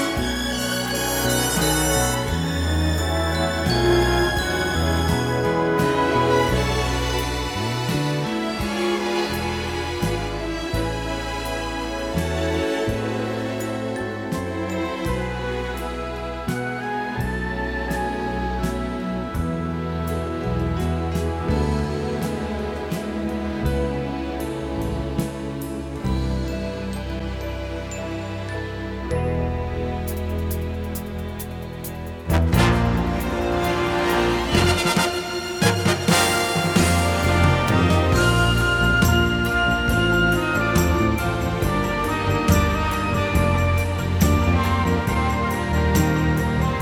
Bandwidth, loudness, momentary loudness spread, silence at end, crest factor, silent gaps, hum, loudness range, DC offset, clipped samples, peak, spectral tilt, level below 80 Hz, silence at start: 19 kHz; -22 LUFS; 10 LU; 0 s; 18 dB; none; none; 8 LU; under 0.1%; under 0.1%; -4 dBFS; -5 dB/octave; -30 dBFS; 0 s